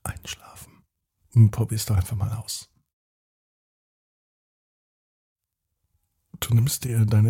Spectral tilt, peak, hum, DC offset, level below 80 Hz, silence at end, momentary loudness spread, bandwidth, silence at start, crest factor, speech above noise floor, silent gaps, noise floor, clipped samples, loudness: -5.5 dB/octave; -6 dBFS; none; under 0.1%; -48 dBFS; 0 s; 16 LU; 17 kHz; 0.05 s; 20 dB; 58 dB; 2.93-5.36 s; -79 dBFS; under 0.1%; -24 LUFS